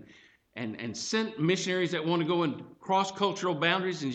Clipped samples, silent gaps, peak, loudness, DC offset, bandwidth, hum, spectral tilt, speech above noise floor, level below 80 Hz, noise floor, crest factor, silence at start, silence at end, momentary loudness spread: under 0.1%; none; -12 dBFS; -29 LUFS; under 0.1%; 8.8 kHz; none; -4.5 dB/octave; 29 dB; -74 dBFS; -58 dBFS; 18 dB; 0 s; 0 s; 11 LU